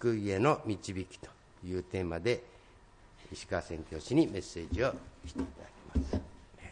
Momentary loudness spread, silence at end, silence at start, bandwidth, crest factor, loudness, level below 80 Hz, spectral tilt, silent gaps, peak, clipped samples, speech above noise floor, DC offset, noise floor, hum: 19 LU; 0 s; 0 s; 10.5 kHz; 20 dB; -35 LUFS; -48 dBFS; -6.5 dB/octave; none; -14 dBFS; under 0.1%; 25 dB; under 0.1%; -59 dBFS; none